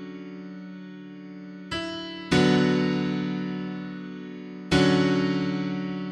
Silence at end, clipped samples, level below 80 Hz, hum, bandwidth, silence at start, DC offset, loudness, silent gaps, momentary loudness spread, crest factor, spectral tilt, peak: 0 s; under 0.1%; -52 dBFS; none; 11 kHz; 0 s; under 0.1%; -25 LUFS; none; 20 LU; 18 dB; -6 dB/octave; -8 dBFS